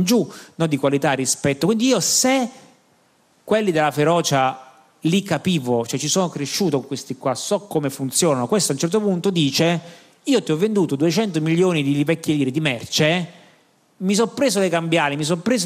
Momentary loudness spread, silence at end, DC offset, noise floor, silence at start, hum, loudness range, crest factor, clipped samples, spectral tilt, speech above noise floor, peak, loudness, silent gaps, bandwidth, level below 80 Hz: 6 LU; 0 s; under 0.1%; -59 dBFS; 0 s; none; 2 LU; 16 dB; under 0.1%; -4.5 dB/octave; 40 dB; -4 dBFS; -20 LUFS; none; 15.5 kHz; -64 dBFS